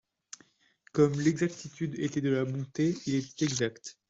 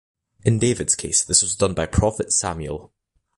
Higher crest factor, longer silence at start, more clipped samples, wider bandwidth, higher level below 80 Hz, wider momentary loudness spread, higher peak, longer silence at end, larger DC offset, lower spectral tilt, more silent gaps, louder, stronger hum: about the same, 18 dB vs 20 dB; first, 0.95 s vs 0.45 s; neither; second, 8 kHz vs 11.5 kHz; second, -68 dBFS vs -36 dBFS; first, 18 LU vs 12 LU; second, -12 dBFS vs -2 dBFS; second, 0.2 s vs 0.5 s; neither; first, -5.5 dB/octave vs -3.5 dB/octave; neither; second, -30 LUFS vs -20 LUFS; neither